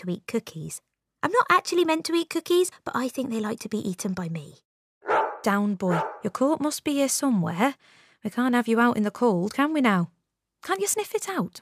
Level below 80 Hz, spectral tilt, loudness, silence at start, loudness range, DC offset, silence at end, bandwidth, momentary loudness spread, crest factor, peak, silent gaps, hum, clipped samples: -72 dBFS; -4.5 dB/octave; -25 LUFS; 0 s; 4 LU; under 0.1%; 0.05 s; 15.5 kHz; 11 LU; 20 dB; -6 dBFS; 4.65-5.01 s; none; under 0.1%